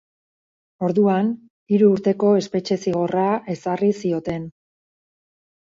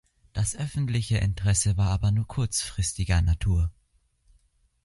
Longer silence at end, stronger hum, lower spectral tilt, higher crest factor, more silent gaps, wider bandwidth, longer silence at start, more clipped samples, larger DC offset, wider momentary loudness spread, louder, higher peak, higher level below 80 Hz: about the same, 1.15 s vs 1.15 s; neither; first, -7.5 dB/octave vs -4.5 dB/octave; about the same, 16 dB vs 16 dB; first, 1.50-1.66 s vs none; second, 7.6 kHz vs 11.5 kHz; first, 0.8 s vs 0.35 s; neither; neither; first, 10 LU vs 6 LU; first, -20 LUFS vs -26 LUFS; first, -4 dBFS vs -10 dBFS; second, -60 dBFS vs -34 dBFS